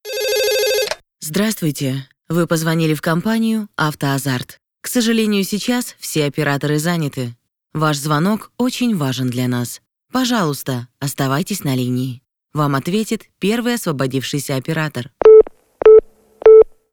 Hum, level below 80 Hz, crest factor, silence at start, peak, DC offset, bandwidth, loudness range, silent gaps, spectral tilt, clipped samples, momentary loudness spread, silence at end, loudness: none; -50 dBFS; 16 dB; 0.05 s; 0 dBFS; under 0.1%; 19 kHz; 7 LU; none; -5 dB/octave; under 0.1%; 15 LU; 0.25 s; -16 LUFS